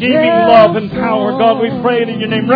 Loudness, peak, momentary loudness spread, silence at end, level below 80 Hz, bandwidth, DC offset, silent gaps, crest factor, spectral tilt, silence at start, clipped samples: -11 LUFS; 0 dBFS; 8 LU; 0 s; -46 dBFS; 5.4 kHz; under 0.1%; none; 10 dB; -8.5 dB/octave; 0 s; 0.4%